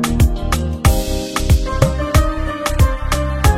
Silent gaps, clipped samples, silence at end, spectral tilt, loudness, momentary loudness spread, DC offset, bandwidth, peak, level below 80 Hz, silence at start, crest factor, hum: none; under 0.1%; 0 s; -5.5 dB/octave; -17 LUFS; 5 LU; under 0.1%; 16.5 kHz; 0 dBFS; -18 dBFS; 0 s; 14 dB; none